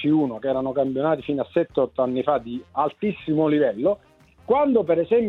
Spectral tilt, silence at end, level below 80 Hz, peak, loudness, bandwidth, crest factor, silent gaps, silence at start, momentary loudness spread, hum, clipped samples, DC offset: -9.5 dB/octave; 0 s; -58 dBFS; -6 dBFS; -23 LUFS; 4.2 kHz; 16 dB; none; 0 s; 6 LU; none; under 0.1%; under 0.1%